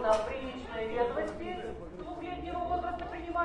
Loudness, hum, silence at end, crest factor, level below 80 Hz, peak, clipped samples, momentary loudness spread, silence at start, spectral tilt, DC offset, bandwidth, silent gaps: -36 LUFS; none; 0 s; 18 dB; -50 dBFS; -16 dBFS; under 0.1%; 10 LU; 0 s; -5.5 dB/octave; under 0.1%; 11 kHz; none